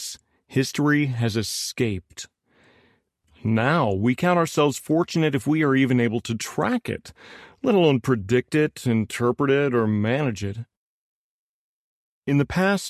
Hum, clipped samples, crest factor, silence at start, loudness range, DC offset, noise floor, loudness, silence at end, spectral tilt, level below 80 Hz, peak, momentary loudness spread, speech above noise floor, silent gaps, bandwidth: none; under 0.1%; 18 dB; 0 s; 4 LU; under 0.1%; -63 dBFS; -22 LUFS; 0 s; -6 dB/octave; -52 dBFS; -6 dBFS; 13 LU; 41 dB; 10.77-12.22 s; 14 kHz